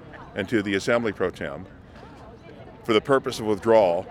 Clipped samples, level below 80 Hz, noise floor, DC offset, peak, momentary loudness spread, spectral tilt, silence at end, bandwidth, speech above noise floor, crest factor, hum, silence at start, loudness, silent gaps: under 0.1%; -54 dBFS; -44 dBFS; under 0.1%; -6 dBFS; 25 LU; -5.5 dB/octave; 0 s; 14.5 kHz; 22 dB; 20 dB; none; 0 s; -23 LUFS; none